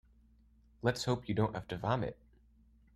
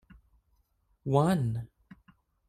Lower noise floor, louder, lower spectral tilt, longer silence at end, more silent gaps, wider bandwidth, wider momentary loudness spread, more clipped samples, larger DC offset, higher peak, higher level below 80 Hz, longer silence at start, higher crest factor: second, -65 dBFS vs -72 dBFS; second, -36 LUFS vs -29 LUFS; second, -6 dB/octave vs -8 dB/octave; about the same, 0.85 s vs 0.8 s; neither; about the same, 13.5 kHz vs 13.5 kHz; second, 4 LU vs 17 LU; neither; neither; second, -16 dBFS vs -10 dBFS; about the same, -60 dBFS vs -60 dBFS; second, 0.85 s vs 1.05 s; about the same, 22 dB vs 22 dB